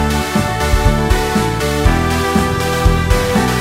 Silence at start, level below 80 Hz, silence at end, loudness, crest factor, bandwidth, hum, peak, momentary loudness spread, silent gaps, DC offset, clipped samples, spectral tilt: 0 s; -18 dBFS; 0 s; -15 LUFS; 12 dB; 16.5 kHz; none; -2 dBFS; 2 LU; none; under 0.1%; under 0.1%; -5 dB/octave